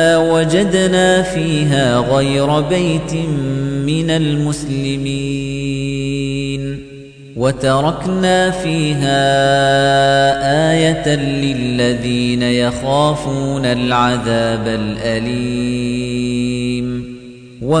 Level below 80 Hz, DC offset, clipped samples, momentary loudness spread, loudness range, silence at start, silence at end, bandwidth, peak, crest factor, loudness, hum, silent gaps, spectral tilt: -38 dBFS; under 0.1%; under 0.1%; 8 LU; 6 LU; 0 s; 0 s; 10 kHz; -2 dBFS; 14 dB; -15 LUFS; none; none; -5.5 dB/octave